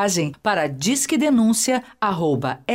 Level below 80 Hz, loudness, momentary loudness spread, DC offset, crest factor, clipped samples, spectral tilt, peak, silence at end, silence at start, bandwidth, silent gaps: -60 dBFS; -20 LUFS; 5 LU; under 0.1%; 12 dB; under 0.1%; -4 dB/octave; -8 dBFS; 0 s; 0 s; 16 kHz; none